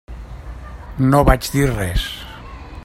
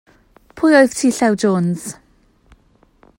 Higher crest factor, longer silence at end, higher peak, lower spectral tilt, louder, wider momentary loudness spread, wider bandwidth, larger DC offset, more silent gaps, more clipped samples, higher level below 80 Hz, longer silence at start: about the same, 20 dB vs 18 dB; second, 0 s vs 1.25 s; about the same, 0 dBFS vs 0 dBFS; about the same, -6 dB/octave vs -5.5 dB/octave; about the same, -17 LUFS vs -15 LUFS; first, 21 LU vs 12 LU; about the same, 16 kHz vs 16.5 kHz; neither; neither; neither; first, -26 dBFS vs -54 dBFS; second, 0.1 s vs 0.55 s